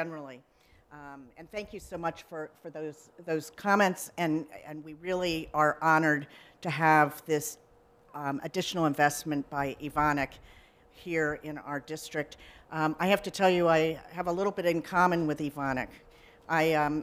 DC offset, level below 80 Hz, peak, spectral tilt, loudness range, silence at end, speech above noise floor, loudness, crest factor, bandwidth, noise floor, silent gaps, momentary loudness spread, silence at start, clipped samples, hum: under 0.1%; -60 dBFS; -10 dBFS; -5 dB/octave; 5 LU; 0 s; 29 dB; -29 LUFS; 22 dB; 16 kHz; -59 dBFS; none; 17 LU; 0 s; under 0.1%; none